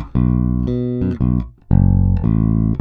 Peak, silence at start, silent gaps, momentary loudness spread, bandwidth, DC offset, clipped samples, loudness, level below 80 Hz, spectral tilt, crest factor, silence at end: 0 dBFS; 0 s; none; 5 LU; 3.9 kHz; under 0.1%; under 0.1%; -17 LUFS; -24 dBFS; -12.5 dB/octave; 14 dB; 0 s